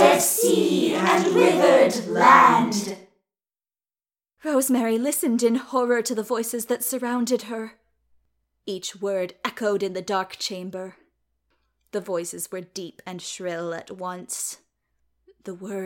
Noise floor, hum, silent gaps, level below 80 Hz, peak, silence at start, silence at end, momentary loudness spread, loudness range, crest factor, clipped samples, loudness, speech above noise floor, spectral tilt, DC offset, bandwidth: under -90 dBFS; none; none; -72 dBFS; -2 dBFS; 0 s; 0 s; 19 LU; 14 LU; 22 dB; under 0.1%; -22 LUFS; over 68 dB; -3.5 dB/octave; under 0.1%; 17 kHz